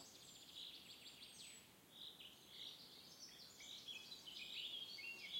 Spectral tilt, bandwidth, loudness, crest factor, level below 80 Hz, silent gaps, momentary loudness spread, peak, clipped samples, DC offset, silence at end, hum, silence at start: -0.5 dB/octave; 16.5 kHz; -54 LUFS; 20 dB; -90 dBFS; none; 10 LU; -36 dBFS; under 0.1%; under 0.1%; 0 s; none; 0 s